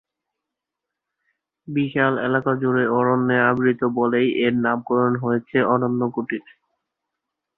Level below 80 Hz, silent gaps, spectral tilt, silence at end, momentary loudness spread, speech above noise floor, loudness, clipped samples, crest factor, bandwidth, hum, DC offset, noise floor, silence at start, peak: -64 dBFS; none; -10.5 dB/octave; 1.2 s; 6 LU; 64 dB; -20 LUFS; under 0.1%; 18 dB; 4 kHz; none; under 0.1%; -84 dBFS; 1.7 s; -4 dBFS